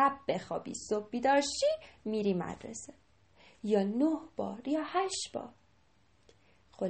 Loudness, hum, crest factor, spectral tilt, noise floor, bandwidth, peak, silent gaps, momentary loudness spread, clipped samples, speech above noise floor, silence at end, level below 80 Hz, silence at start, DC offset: -33 LUFS; none; 20 dB; -4.5 dB/octave; -69 dBFS; 8.8 kHz; -14 dBFS; none; 15 LU; under 0.1%; 36 dB; 0 s; -68 dBFS; 0 s; under 0.1%